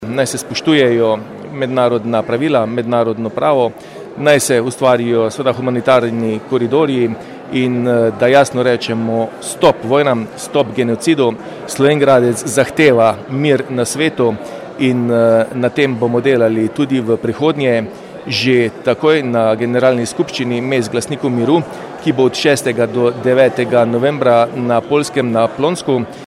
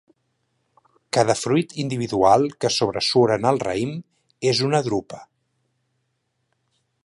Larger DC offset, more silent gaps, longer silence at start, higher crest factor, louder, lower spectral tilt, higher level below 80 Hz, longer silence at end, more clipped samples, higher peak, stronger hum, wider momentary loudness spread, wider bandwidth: neither; neither; second, 0 s vs 1.15 s; second, 14 dB vs 20 dB; first, -14 LUFS vs -21 LUFS; about the same, -5.5 dB/octave vs -5 dB/octave; about the same, -56 dBFS vs -58 dBFS; second, 0 s vs 1.8 s; neither; about the same, 0 dBFS vs -2 dBFS; neither; second, 7 LU vs 10 LU; first, 15.5 kHz vs 11.5 kHz